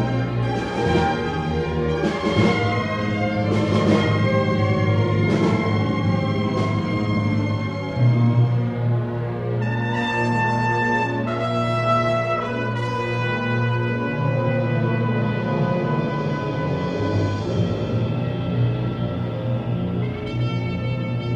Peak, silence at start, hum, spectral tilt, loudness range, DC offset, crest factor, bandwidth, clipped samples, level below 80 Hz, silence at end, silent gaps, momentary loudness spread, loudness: -4 dBFS; 0 s; none; -7.5 dB/octave; 4 LU; under 0.1%; 16 dB; 8.2 kHz; under 0.1%; -44 dBFS; 0 s; none; 5 LU; -22 LUFS